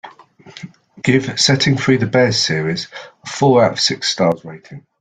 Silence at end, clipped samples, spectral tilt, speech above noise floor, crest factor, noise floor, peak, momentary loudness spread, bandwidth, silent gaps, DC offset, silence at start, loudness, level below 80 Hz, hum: 0.2 s; under 0.1%; -4.5 dB/octave; 26 dB; 16 dB; -42 dBFS; 0 dBFS; 21 LU; 9.4 kHz; none; under 0.1%; 0.05 s; -15 LUFS; -52 dBFS; none